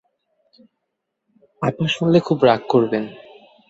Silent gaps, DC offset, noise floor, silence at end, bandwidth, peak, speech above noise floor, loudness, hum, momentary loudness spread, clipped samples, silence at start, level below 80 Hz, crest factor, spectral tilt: none; under 0.1%; -78 dBFS; 0.5 s; 8 kHz; -2 dBFS; 60 dB; -18 LUFS; none; 10 LU; under 0.1%; 1.6 s; -60 dBFS; 20 dB; -7 dB/octave